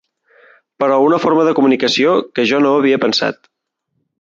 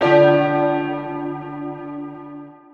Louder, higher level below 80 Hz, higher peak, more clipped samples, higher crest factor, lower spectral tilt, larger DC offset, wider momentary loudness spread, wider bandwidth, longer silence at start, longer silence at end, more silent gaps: first, -14 LUFS vs -19 LUFS; about the same, -64 dBFS vs -60 dBFS; about the same, -2 dBFS vs -2 dBFS; neither; about the same, 14 dB vs 18 dB; second, -5 dB/octave vs -8 dB/octave; neither; second, 4 LU vs 22 LU; first, 7.6 kHz vs 6.6 kHz; first, 0.8 s vs 0 s; first, 0.9 s vs 0.2 s; neither